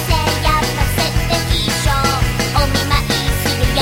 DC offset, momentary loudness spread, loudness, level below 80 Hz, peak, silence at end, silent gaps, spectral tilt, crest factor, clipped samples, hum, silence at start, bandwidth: under 0.1%; 2 LU; -16 LUFS; -22 dBFS; -2 dBFS; 0 s; none; -4 dB/octave; 14 dB; under 0.1%; none; 0 s; 16.5 kHz